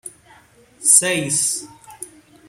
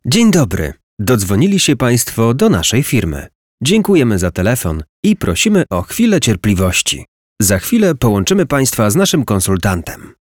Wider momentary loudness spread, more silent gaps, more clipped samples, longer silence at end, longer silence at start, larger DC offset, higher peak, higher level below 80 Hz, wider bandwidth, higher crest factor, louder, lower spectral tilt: first, 24 LU vs 7 LU; second, none vs 0.83-0.97 s, 3.35-3.58 s, 4.89-5.03 s, 7.08-7.36 s; neither; first, 0.4 s vs 0.2 s; about the same, 0.05 s vs 0.05 s; neither; about the same, 0 dBFS vs -2 dBFS; second, -62 dBFS vs -34 dBFS; second, 16.5 kHz vs 19.5 kHz; first, 22 dB vs 10 dB; about the same, -15 LUFS vs -13 LUFS; second, -1.5 dB/octave vs -4.5 dB/octave